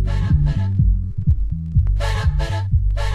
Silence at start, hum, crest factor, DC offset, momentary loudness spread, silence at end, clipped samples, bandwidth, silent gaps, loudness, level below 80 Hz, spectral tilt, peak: 0 s; none; 12 dB; under 0.1%; 3 LU; 0 s; under 0.1%; 10 kHz; none; -20 LUFS; -20 dBFS; -7.5 dB/octave; -4 dBFS